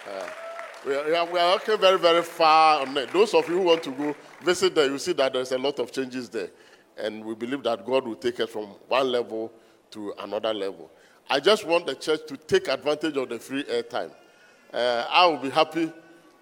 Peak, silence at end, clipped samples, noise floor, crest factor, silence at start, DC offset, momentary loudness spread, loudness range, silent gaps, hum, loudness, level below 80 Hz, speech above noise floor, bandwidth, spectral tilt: -6 dBFS; 0.4 s; under 0.1%; -54 dBFS; 20 dB; 0 s; under 0.1%; 15 LU; 8 LU; none; none; -24 LUFS; -72 dBFS; 30 dB; 17 kHz; -3.5 dB/octave